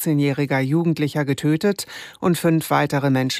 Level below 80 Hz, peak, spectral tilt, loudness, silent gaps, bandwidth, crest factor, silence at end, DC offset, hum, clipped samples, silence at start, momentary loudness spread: -62 dBFS; -6 dBFS; -6 dB/octave; -20 LUFS; none; 15.5 kHz; 14 dB; 0 s; under 0.1%; none; under 0.1%; 0 s; 4 LU